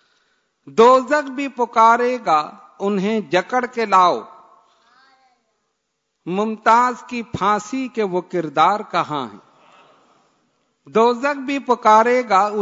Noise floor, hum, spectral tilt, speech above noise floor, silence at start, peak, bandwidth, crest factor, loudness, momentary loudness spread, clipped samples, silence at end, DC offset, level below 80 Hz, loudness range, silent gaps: -74 dBFS; none; -5 dB/octave; 56 dB; 0.65 s; -2 dBFS; 7.8 kHz; 18 dB; -18 LUFS; 13 LU; under 0.1%; 0 s; under 0.1%; -64 dBFS; 5 LU; none